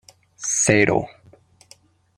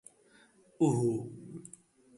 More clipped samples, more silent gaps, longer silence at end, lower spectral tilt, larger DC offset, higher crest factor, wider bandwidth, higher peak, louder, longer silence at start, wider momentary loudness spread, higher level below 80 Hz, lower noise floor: neither; neither; first, 1.1 s vs 0.55 s; second, -3.5 dB/octave vs -8 dB/octave; neither; about the same, 22 dB vs 18 dB; first, 16 kHz vs 11.5 kHz; first, -2 dBFS vs -16 dBFS; first, -19 LUFS vs -31 LUFS; second, 0.4 s vs 0.8 s; second, 14 LU vs 20 LU; first, -54 dBFS vs -72 dBFS; second, -54 dBFS vs -64 dBFS